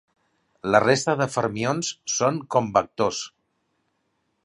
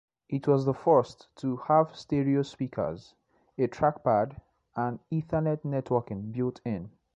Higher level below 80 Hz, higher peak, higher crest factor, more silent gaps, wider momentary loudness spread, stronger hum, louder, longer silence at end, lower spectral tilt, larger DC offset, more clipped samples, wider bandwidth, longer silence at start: about the same, -60 dBFS vs -60 dBFS; first, -2 dBFS vs -10 dBFS; about the same, 22 dB vs 20 dB; neither; second, 8 LU vs 11 LU; neither; first, -23 LUFS vs -29 LUFS; first, 1.15 s vs 0.3 s; second, -4 dB/octave vs -8.5 dB/octave; neither; neither; first, 11.5 kHz vs 8.2 kHz; first, 0.65 s vs 0.3 s